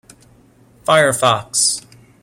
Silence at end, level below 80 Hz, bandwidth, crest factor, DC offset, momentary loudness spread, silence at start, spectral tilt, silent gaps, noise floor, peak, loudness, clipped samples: 0.45 s; -56 dBFS; 16.5 kHz; 16 dB; under 0.1%; 11 LU; 0.85 s; -2 dB/octave; none; -50 dBFS; -2 dBFS; -15 LUFS; under 0.1%